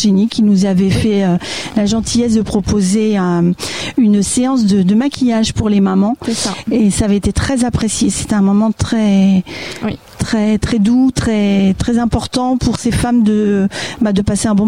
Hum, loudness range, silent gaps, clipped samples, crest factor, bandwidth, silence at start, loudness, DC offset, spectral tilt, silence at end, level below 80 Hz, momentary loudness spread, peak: none; 1 LU; none; under 0.1%; 12 dB; 15 kHz; 0 s; -14 LUFS; 0.5%; -5.5 dB/octave; 0 s; -32 dBFS; 6 LU; 0 dBFS